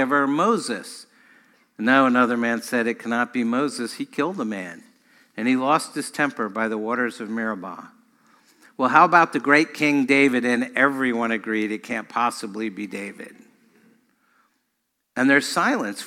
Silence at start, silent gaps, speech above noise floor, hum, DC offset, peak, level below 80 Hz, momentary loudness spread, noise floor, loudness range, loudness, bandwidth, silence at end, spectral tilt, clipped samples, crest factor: 0 s; none; 54 dB; none; under 0.1%; 0 dBFS; -70 dBFS; 15 LU; -75 dBFS; 9 LU; -21 LUFS; 15 kHz; 0 s; -4.5 dB/octave; under 0.1%; 22 dB